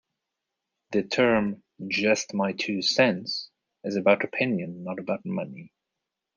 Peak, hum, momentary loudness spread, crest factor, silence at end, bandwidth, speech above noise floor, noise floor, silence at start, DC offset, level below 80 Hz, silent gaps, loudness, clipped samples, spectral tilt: -6 dBFS; none; 12 LU; 22 dB; 0.7 s; 10 kHz; 59 dB; -85 dBFS; 0.9 s; under 0.1%; -70 dBFS; none; -26 LUFS; under 0.1%; -4.5 dB/octave